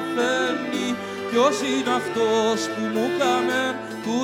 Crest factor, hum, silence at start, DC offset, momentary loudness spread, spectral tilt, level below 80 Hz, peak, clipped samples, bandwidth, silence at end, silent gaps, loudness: 18 dB; none; 0 s; under 0.1%; 7 LU; -3.5 dB/octave; -66 dBFS; -6 dBFS; under 0.1%; 17 kHz; 0 s; none; -23 LUFS